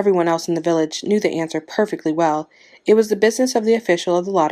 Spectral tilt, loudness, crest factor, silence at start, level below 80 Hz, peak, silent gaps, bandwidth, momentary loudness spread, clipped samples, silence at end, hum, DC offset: -5 dB/octave; -19 LUFS; 16 dB; 0 s; -68 dBFS; -2 dBFS; none; 14.5 kHz; 7 LU; under 0.1%; 0 s; none; under 0.1%